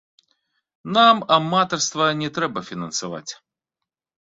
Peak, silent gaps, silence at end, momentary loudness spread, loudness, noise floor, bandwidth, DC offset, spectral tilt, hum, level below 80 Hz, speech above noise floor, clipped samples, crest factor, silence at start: -2 dBFS; none; 1 s; 17 LU; -19 LUFS; -85 dBFS; 8 kHz; under 0.1%; -3.5 dB/octave; none; -64 dBFS; 65 dB; under 0.1%; 20 dB; 0.85 s